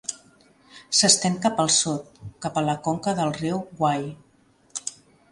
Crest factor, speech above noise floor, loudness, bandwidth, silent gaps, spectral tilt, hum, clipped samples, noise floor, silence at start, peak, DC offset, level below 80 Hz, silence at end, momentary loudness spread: 24 dB; 33 dB; -23 LUFS; 11.5 kHz; none; -3 dB/octave; none; under 0.1%; -56 dBFS; 0.1 s; 0 dBFS; under 0.1%; -60 dBFS; 0.4 s; 16 LU